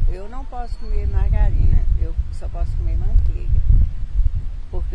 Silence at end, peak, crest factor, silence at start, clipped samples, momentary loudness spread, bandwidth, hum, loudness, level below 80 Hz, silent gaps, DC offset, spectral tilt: 0 s; -2 dBFS; 14 dB; 0 s; under 0.1%; 12 LU; 4.6 kHz; none; -23 LUFS; -18 dBFS; none; under 0.1%; -9 dB/octave